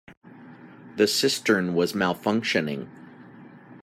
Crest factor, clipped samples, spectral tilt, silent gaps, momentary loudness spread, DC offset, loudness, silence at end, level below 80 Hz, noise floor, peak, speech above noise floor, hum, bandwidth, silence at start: 20 dB; under 0.1%; -4 dB/octave; 0.17-0.21 s; 13 LU; under 0.1%; -24 LUFS; 0.05 s; -70 dBFS; -47 dBFS; -8 dBFS; 23 dB; none; 15.5 kHz; 0.1 s